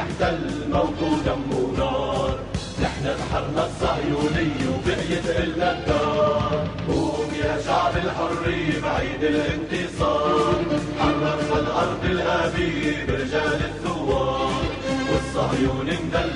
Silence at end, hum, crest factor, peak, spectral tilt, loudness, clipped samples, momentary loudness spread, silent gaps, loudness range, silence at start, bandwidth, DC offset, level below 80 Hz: 0 s; none; 14 dB; -8 dBFS; -6 dB/octave; -23 LUFS; under 0.1%; 4 LU; none; 2 LU; 0 s; 10.5 kHz; under 0.1%; -36 dBFS